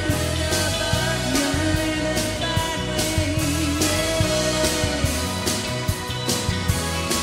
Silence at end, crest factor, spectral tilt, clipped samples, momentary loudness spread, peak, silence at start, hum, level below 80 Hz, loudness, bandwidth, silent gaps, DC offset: 0 s; 16 dB; -3.5 dB/octave; under 0.1%; 3 LU; -6 dBFS; 0 s; none; -34 dBFS; -22 LUFS; 16 kHz; none; under 0.1%